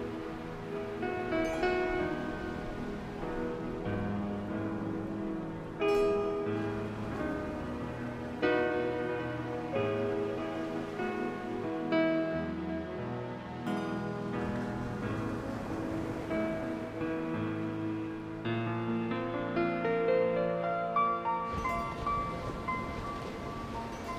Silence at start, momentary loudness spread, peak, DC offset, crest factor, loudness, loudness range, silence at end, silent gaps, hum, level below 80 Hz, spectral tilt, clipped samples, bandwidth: 0 s; 9 LU; -16 dBFS; under 0.1%; 18 dB; -34 LUFS; 5 LU; 0 s; none; none; -52 dBFS; -7 dB/octave; under 0.1%; 15 kHz